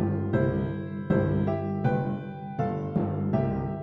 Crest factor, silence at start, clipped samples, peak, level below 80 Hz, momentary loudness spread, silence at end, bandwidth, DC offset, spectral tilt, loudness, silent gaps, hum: 16 dB; 0 s; under 0.1%; -10 dBFS; -48 dBFS; 6 LU; 0 s; 5.8 kHz; under 0.1%; -11 dB/octave; -28 LUFS; none; 50 Hz at -35 dBFS